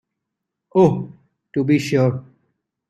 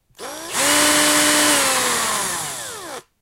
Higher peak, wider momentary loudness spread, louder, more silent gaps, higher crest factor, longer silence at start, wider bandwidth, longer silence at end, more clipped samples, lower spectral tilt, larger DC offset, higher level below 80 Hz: about the same, -2 dBFS vs -2 dBFS; second, 14 LU vs 18 LU; second, -19 LUFS vs -16 LUFS; neither; about the same, 18 dB vs 18 dB; first, 0.75 s vs 0.2 s; second, 13 kHz vs 16 kHz; first, 0.7 s vs 0.2 s; neither; first, -7.5 dB/octave vs -0.5 dB/octave; neither; about the same, -58 dBFS vs -54 dBFS